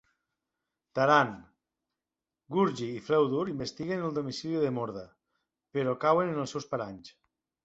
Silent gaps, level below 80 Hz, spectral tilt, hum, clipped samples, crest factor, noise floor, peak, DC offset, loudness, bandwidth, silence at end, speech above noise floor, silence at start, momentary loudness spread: none; -68 dBFS; -6 dB/octave; none; under 0.1%; 22 dB; under -90 dBFS; -8 dBFS; under 0.1%; -30 LUFS; 8 kHz; 0.55 s; over 61 dB; 0.95 s; 13 LU